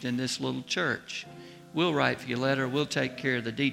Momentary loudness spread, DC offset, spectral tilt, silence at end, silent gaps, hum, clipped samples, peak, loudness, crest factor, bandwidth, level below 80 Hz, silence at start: 11 LU; under 0.1%; -4.5 dB/octave; 0 s; none; none; under 0.1%; -8 dBFS; -29 LUFS; 22 dB; 15.5 kHz; -68 dBFS; 0 s